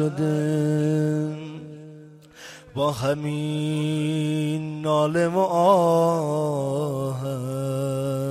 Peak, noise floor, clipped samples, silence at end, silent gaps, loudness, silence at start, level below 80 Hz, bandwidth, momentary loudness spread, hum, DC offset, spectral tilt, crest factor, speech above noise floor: -6 dBFS; -45 dBFS; under 0.1%; 0 s; none; -23 LUFS; 0 s; -62 dBFS; 14 kHz; 17 LU; none; under 0.1%; -7 dB/octave; 18 dB; 23 dB